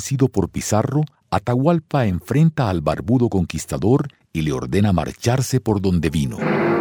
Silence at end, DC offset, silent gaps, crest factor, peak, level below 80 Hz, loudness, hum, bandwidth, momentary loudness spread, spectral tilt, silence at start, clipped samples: 0 s; under 0.1%; none; 16 dB; -2 dBFS; -40 dBFS; -20 LUFS; none; over 20 kHz; 5 LU; -6.5 dB/octave; 0 s; under 0.1%